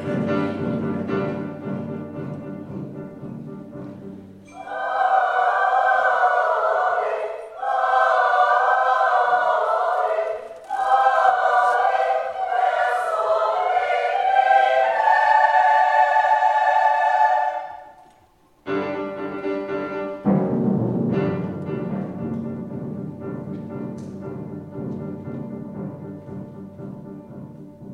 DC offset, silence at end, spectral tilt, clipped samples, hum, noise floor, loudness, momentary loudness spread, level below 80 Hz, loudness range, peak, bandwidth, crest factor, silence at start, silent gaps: under 0.1%; 0 s; -6.5 dB/octave; under 0.1%; none; -56 dBFS; -20 LUFS; 19 LU; -62 dBFS; 15 LU; -4 dBFS; 10.5 kHz; 18 dB; 0 s; none